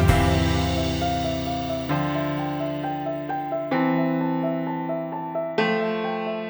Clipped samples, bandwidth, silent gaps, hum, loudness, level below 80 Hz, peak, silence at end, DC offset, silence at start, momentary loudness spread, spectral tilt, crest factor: under 0.1%; over 20 kHz; none; none; -25 LUFS; -36 dBFS; -2 dBFS; 0 s; under 0.1%; 0 s; 6 LU; -6.5 dB/octave; 22 dB